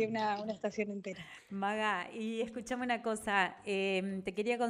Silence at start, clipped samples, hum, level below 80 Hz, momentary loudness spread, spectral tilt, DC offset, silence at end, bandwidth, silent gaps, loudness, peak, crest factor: 0 s; under 0.1%; none; -70 dBFS; 7 LU; -4.5 dB/octave; under 0.1%; 0 s; 15 kHz; none; -36 LUFS; -16 dBFS; 20 dB